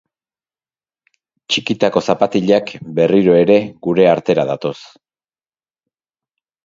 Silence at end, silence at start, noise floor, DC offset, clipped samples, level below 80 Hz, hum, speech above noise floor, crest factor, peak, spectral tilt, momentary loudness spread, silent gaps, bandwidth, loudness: 1.9 s; 1.5 s; under -90 dBFS; under 0.1%; under 0.1%; -56 dBFS; none; over 76 dB; 16 dB; 0 dBFS; -6 dB/octave; 10 LU; none; 7.6 kHz; -15 LUFS